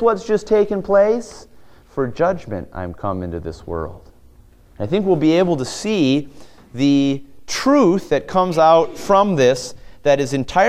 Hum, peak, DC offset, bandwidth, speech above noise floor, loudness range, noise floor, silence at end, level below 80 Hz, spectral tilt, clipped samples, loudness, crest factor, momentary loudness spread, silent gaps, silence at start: none; 0 dBFS; under 0.1%; 14.5 kHz; 30 dB; 9 LU; -47 dBFS; 0 s; -44 dBFS; -6 dB/octave; under 0.1%; -18 LUFS; 18 dB; 14 LU; none; 0 s